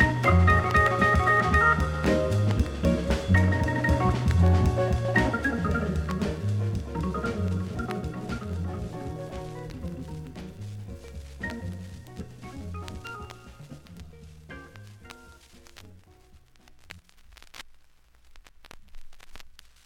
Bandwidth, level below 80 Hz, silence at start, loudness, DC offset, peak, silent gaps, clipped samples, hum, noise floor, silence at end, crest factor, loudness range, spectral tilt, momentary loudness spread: 13 kHz; -36 dBFS; 0 s; -25 LUFS; under 0.1%; -8 dBFS; none; under 0.1%; none; -56 dBFS; 0.35 s; 20 dB; 21 LU; -7 dB/octave; 25 LU